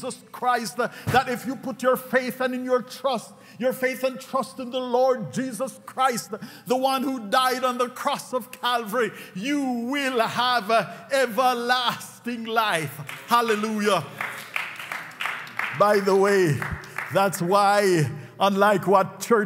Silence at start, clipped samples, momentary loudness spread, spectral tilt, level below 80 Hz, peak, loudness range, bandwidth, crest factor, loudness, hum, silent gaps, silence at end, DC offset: 0 s; under 0.1%; 11 LU; -4.5 dB/octave; -60 dBFS; -4 dBFS; 4 LU; 16 kHz; 20 dB; -24 LUFS; none; none; 0 s; under 0.1%